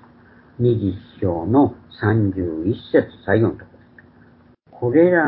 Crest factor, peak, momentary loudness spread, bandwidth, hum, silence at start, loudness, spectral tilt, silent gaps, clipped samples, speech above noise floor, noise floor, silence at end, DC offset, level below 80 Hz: 18 dB; -2 dBFS; 8 LU; 4.7 kHz; none; 0.6 s; -20 LUFS; -13 dB/octave; none; under 0.1%; 33 dB; -51 dBFS; 0 s; under 0.1%; -44 dBFS